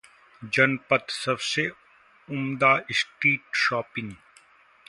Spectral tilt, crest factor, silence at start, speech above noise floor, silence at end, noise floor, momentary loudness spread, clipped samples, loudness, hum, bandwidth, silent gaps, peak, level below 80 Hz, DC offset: -4 dB/octave; 22 dB; 0.4 s; 31 dB; 0.75 s; -57 dBFS; 12 LU; under 0.1%; -24 LUFS; none; 11.5 kHz; none; -4 dBFS; -68 dBFS; under 0.1%